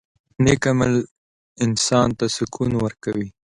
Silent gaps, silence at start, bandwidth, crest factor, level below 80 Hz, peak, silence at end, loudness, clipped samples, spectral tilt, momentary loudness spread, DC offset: 1.11-1.56 s; 0.4 s; 11 kHz; 18 dB; -44 dBFS; -2 dBFS; 0.2 s; -21 LUFS; under 0.1%; -5 dB/octave; 9 LU; under 0.1%